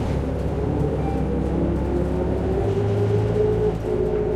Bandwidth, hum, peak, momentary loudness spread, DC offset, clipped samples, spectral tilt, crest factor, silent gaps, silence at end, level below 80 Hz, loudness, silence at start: 9.8 kHz; none; -10 dBFS; 3 LU; under 0.1%; under 0.1%; -9 dB/octave; 12 dB; none; 0 s; -30 dBFS; -23 LUFS; 0 s